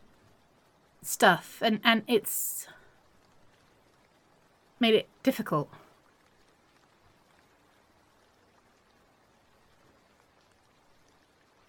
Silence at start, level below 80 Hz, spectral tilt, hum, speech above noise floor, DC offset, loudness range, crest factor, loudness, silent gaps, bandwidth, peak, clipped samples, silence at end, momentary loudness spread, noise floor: 1.05 s; -76 dBFS; -3 dB/octave; none; 38 dB; under 0.1%; 9 LU; 26 dB; -27 LUFS; none; 17.5 kHz; -6 dBFS; under 0.1%; 6.05 s; 15 LU; -65 dBFS